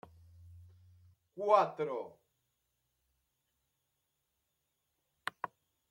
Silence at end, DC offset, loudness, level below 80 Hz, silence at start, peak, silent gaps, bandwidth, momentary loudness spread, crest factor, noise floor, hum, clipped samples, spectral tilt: 0.45 s; under 0.1%; -34 LUFS; -80 dBFS; 0.5 s; -12 dBFS; none; 14 kHz; 19 LU; 28 dB; -84 dBFS; none; under 0.1%; -5.5 dB/octave